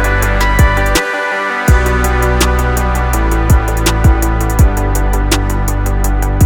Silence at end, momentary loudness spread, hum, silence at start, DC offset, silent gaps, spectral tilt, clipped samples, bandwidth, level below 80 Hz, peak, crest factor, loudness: 0 s; 4 LU; none; 0 s; under 0.1%; none; -5 dB/octave; under 0.1%; 18.5 kHz; -14 dBFS; 0 dBFS; 10 dB; -13 LUFS